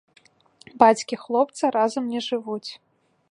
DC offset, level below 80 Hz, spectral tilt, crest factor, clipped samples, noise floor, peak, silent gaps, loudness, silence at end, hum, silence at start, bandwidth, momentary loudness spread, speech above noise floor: under 0.1%; -72 dBFS; -4 dB/octave; 22 dB; under 0.1%; -56 dBFS; -2 dBFS; none; -22 LUFS; 0.55 s; none; 0.75 s; 11 kHz; 14 LU; 34 dB